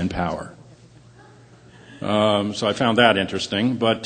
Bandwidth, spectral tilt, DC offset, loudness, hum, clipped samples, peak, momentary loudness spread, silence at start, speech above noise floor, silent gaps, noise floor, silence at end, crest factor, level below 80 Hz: 9.4 kHz; -5 dB/octave; under 0.1%; -20 LUFS; none; under 0.1%; 0 dBFS; 14 LU; 0 s; 28 dB; none; -48 dBFS; 0 s; 22 dB; -50 dBFS